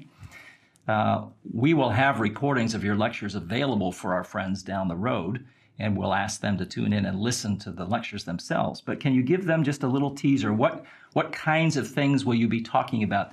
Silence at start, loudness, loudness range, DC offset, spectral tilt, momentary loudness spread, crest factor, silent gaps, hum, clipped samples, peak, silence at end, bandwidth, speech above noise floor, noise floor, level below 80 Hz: 0 s; -26 LUFS; 4 LU; under 0.1%; -6 dB/octave; 8 LU; 20 dB; none; none; under 0.1%; -6 dBFS; 0 s; 14 kHz; 26 dB; -52 dBFS; -64 dBFS